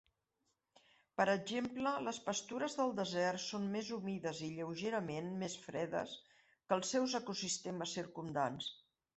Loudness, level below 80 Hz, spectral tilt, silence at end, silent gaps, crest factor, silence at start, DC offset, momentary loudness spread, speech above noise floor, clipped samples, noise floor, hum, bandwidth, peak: -40 LUFS; -78 dBFS; -4 dB/octave; 0.45 s; none; 22 dB; 1.2 s; under 0.1%; 7 LU; 45 dB; under 0.1%; -85 dBFS; none; 8.2 kHz; -18 dBFS